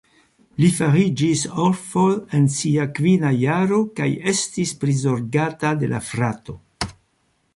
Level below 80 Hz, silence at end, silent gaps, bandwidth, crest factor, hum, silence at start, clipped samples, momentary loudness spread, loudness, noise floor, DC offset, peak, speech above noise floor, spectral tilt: -52 dBFS; 0.65 s; none; 11.5 kHz; 16 dB; none; 0.6 s; under 0.1%; 9 LU; -20 LUFS; -66 dBFS; under 0.1%; -4 dBFS; 47 dB; -5.5 dB/octave